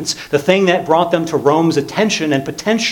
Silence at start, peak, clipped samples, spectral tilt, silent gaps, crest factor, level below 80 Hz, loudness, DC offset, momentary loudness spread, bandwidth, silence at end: 0 s; 0 dBFS; under 0.1%; -4.5 dB/octave; none; 14 dB; -54 dBFS; -15 LUFS; under 0.1%; 5 LU; 18.5 kHz; 0 s